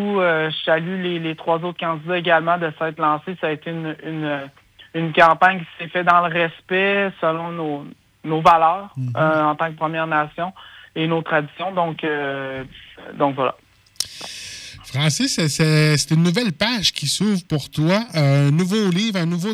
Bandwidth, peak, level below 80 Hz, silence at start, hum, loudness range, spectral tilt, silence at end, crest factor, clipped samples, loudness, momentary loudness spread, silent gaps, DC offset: 15 kHz; -2 dBFS; -56 dBFS; 0 s; none; 5 LU; -5 dB/octave; 0 s; 18 dB; under 0.1%; -20 LUFS; 12 LU; none; under 0.1%